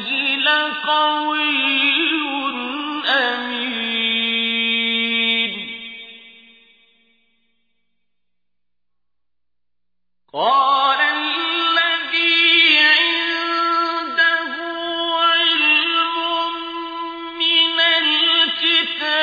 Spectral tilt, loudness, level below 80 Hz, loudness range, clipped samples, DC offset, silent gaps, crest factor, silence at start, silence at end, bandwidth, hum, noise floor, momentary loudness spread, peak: -2.5 dB/octave; -16 LUFS; -70 dBFS; 8 LU; under 0.1%; under 0.1%; none; 18 dB; 0 s; 0 s; 5 kHz; 60 Hz at -80 dBFS; -85 dBFS; 11 LU; -2 dBFS